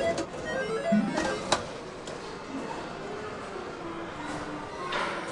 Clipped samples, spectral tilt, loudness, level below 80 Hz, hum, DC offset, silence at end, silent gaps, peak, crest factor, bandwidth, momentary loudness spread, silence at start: under 0.1%; -4.5 dB/octave; -32 LUFS; -56 dBFS; none; under 0.1%; 0 s; none; -8 dBFS; 24 dB; 11.5 kHz; 12 LU; 0 s